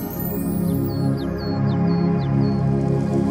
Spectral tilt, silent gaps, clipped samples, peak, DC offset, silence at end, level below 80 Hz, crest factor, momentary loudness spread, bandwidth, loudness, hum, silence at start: -8.5 dB/octave; none; under 0.1%; -8 dBFS; under 0.1%; 0 s; -40 dBFS; 12 dB; 5 LU; 16 kHz; -21 LUFS; none; 0 s